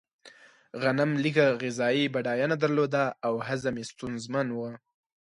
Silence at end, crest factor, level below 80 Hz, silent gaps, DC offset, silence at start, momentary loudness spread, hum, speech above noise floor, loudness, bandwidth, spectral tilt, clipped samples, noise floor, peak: 0.45 s; 20 dB; -68 dBFS; none; under 0.1%; 0.25 s; 12 LU; none; 27 dB; -28 LUFS; 11.5 kHz; -6 dB/octave; under 0.1%; -55 dBFS; -10 dBFS